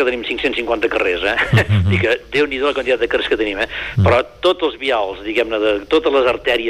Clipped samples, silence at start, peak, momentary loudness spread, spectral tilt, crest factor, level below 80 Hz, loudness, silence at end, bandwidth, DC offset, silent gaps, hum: under 0.1%; 0 s; -4 dBFS; 5 LU; -6.5 dB/octave; 12 dB; -40 dBFS; -17 LUFS; 0 s; 13 kHz; under 0.1%; none; none